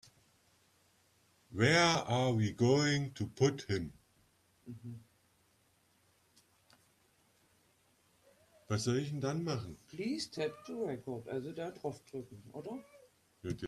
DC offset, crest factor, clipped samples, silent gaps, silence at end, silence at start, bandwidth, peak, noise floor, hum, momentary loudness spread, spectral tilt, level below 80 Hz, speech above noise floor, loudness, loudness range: under 0.1%; 22 dB; under 0.1%; none; 0 s; 1.5 s; 13.5 kHz; -14 dBFS; -72 dBFS; none; 19 LU; -5 dB/octave; -68 dBFS; 37 dB; -35 LUFS; 16 LU